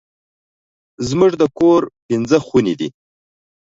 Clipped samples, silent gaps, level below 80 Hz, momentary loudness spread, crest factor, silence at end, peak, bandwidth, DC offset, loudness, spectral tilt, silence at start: under 0.1%; 2.02-2.09 s; -52 dBFS; 10 LU; 18 dB; 0.85 s; 0 dBFS; 7.8 kHz; under 0.1%; -16 LUFS; -6.5 dB/octave; 1 s